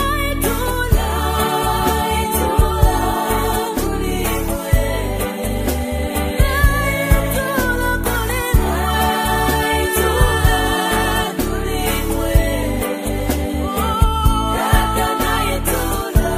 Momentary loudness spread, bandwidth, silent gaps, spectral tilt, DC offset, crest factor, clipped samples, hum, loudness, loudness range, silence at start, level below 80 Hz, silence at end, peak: 5 LU; 15.5 kHz; none; -4.5 dB/octave; under 0.1%; 16 dB; under 0.1%; none; -18 LUFS; 2 LU; 0 s; -22 dBFS; 0 s; 0 dBFS